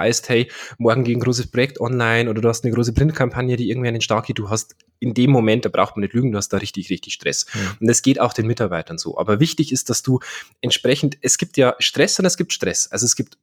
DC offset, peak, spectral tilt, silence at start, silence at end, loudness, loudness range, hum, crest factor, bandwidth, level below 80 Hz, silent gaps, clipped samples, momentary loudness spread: under 0.1%; -2 dBFS; -4 dB/octave; 0 s; 0.15 s; -19 LUFS; 2 LU; none; 18 dB; 18.5 kHz; -44 dBFS; none; under 0.1%; 8 LU